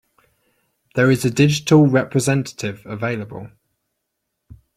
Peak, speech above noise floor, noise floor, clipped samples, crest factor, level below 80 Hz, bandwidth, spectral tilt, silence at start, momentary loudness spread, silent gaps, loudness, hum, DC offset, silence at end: -2 dBFS; 59 dB; -76 dBFS; under 0.1%; 18 dB; -54 dBFS; 15 kHz; -6 dB/octave; 0.95 s; 15 LU; none; -18 LUFS; none; under 0.1%; 1.3 s